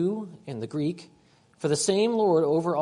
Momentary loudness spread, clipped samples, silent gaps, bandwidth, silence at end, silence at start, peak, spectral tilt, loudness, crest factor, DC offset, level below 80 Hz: 14 LU; under 0.1%; none; 11 kHz; 0 s; 0 s; -12 dBFS; -5 dB/octave; -25 LUFS; 14 dB; under 0.1%; -70 dBFS